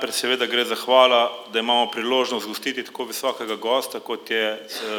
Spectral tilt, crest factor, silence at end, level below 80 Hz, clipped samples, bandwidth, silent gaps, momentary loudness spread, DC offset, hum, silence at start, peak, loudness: -1.5 dB/octave; 20 dB; 0 s; -88 dBFS; under 0.1%; over 20 kHz; none; 12 LU; under 0.1%; none; 0 s; -2 dBFS; -22 LUFS